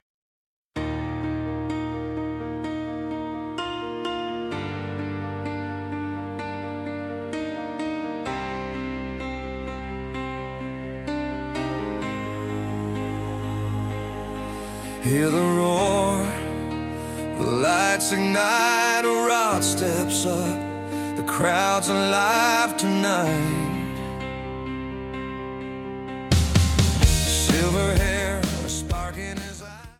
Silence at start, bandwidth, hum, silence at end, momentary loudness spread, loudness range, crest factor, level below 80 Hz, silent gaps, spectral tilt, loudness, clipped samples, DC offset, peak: 0.75 s; 16 kHz; none; 0.05 s; 12 LU; 9 LU; 20 dB; -36 dBFS; none; -4.5 dB/octave; -25 LUFS; under 0.1%; under 0.1%; -4 dBFS